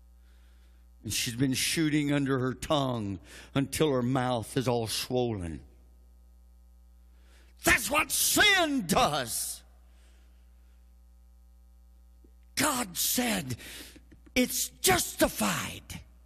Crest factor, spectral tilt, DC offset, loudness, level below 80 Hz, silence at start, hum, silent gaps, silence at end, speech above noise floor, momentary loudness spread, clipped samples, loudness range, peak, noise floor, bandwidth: 20 dB; -3 dB/octave; under 0.1%; -28 LUFS; -52 dBFS; 1.05 s; none; none; 0.2 s; 27 dB; 15 LU; under 0.1%; 8 LU; -10 dBFS; -56 dBFS; 14.5 kHz